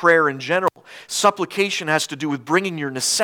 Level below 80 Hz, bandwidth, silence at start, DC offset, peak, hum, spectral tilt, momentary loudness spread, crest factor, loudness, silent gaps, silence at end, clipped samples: -72 dBFS; 19 kHz; 0 s; under 0.1%; -2 dBFS; none; -3 dB/octave; 7 LU; 20 dB; -20 LUFS; none; 0 s; under 0.1%